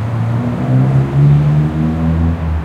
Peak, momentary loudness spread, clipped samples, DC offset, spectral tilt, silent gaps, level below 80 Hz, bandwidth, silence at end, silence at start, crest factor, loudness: -2 dBFS; 6 LU; under 0.1%; under 0.1%; -9.5 dB/octave; none; -28 dBFS; 5 kHz; 0 s; 0 s; 10 dB; -13 LUFS